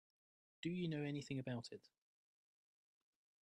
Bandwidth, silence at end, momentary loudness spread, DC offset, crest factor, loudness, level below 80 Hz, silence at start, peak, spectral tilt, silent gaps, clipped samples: 10.5 kHz; 1.65 s; 10 LU; under 0.1%; 18 dB; -46 LUFS; -84 dBFS; 0.65 s; -32 dBFS; -6.5 dB/octave; none; under 0.1%